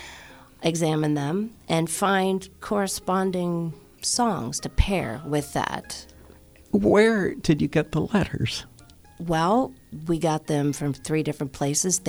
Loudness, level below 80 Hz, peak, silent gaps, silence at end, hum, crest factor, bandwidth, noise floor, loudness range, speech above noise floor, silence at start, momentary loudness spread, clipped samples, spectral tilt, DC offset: -25 LUFS; -40 dBFS; -4 dBFS; none; 0 s; none; 20 dB; over 20 kHz; -50 dBFS; 3 LU; 26 dB; 0 s; 9 LU; under 0.1%; -5 dB/octave; under 0.1%